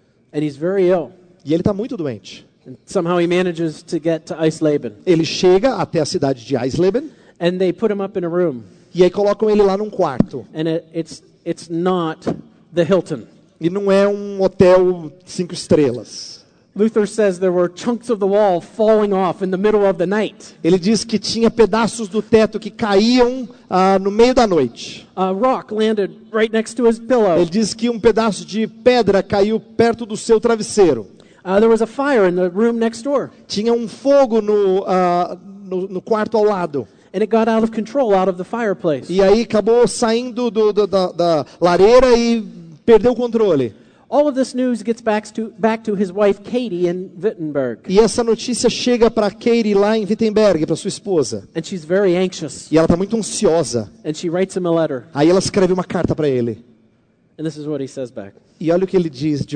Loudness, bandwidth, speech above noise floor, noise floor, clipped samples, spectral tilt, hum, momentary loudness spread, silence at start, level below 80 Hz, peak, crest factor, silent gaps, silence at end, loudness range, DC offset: -17 LUFS; 9.4 kHz; 41 dB; -57 dBFS; under 0.1%; -5.5 dB/octave; none; 11 LU; 0.35 s; -44 dBFS; 0 dBFS; 16 dB; none; 0 s; 5 LU; under 0.1%